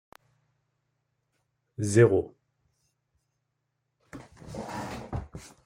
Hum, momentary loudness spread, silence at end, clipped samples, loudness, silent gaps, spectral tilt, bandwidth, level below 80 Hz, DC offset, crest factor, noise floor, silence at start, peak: none; 26 LU; 0.2 s; under 0.1%; -27 LUFS; none; -6.5 dB/octave; 15 kHz; -56 dBFS; under 0.1%; 24 dB; -80 dBFS; 1.8 s; -8 dBFS